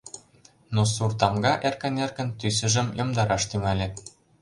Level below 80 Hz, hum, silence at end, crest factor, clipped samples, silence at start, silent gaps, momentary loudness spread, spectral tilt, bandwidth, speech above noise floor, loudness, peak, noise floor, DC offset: -48 dBFS; none; 0.35 s; 22 dB; under 0.1%; 0.05 s; none; 8 LU; -4.5 dB/octave; 11.5 kHz; 32 dB; -25 LUFS; -4 dBFS; -57 dBFS; under 0.1%